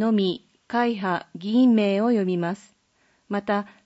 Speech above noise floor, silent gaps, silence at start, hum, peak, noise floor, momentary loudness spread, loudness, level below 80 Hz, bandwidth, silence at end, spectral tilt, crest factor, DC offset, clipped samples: 43 dB; none; 0 s; none; -10 dBFS; -65 dBFS; 12 LU; -23 LUFS; -70 dBFS; 8 kHz; 0.2 s; -7.5 dB/octave; 12 dB; under 0.1%; under 0.1%